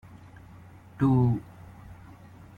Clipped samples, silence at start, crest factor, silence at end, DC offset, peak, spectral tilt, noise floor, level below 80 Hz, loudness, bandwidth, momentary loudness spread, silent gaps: under 0.1%; 0.15 s; 18 dB; 0.65 s; under 0.1%; -12 dBFS; -10.5 dB/octave; -49 dBFS; -54 dBFS; -26 LUFS; 4.2 kHz; 27 LU; none